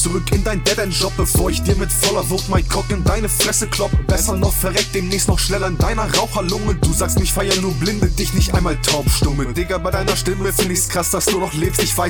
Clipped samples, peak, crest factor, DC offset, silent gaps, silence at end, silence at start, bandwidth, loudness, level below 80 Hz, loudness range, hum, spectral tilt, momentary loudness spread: under 0.1%; -4 dBFS; 14 dB; under 0.1%; none; 0 s; 0 s; over 20 kHz; -17 LUFS; -24 dBFS; 1 LU; none; -4 dB/octave; 3 LU